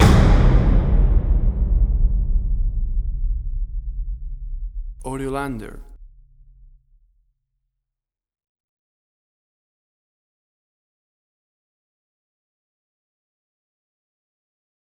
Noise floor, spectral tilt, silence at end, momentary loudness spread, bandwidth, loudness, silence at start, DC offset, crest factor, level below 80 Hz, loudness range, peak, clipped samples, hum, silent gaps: -86 dBFS; -7 dB/octave; 8.95 s; 18 LU; 11 kHz; -22 LUFS; 0 s; under 0.1%; 20 dB; -22 dBFS; 13 LU; -2 dBFS; under 0.1%; none; none